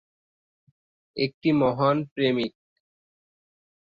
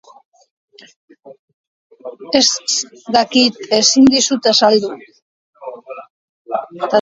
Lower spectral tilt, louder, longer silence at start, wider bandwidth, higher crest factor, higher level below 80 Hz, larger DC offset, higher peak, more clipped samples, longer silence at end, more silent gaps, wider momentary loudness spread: first, -8.5 dB/octave vs -2 dB/octave; second, -25 LUFS vs -13 LUFS; about the same, 1.15 s vs 1.25 s; second, 7 kHz vs 8 kHz; about the same, 18 dB vs 18 dB; second, -64 dBFS vs -58 dBFS; neither; second, -10 dBFS vs 0 dBFS; neither; first, 1.35 s vs 0 s; second, 1.34-1.41 s, 2.11-2.16 s vs 1.39-1.48 s, 1.54-1.90 s, 5.22-5.53 s, 6.10-6.45 s; second, 9 LU vs 24 LU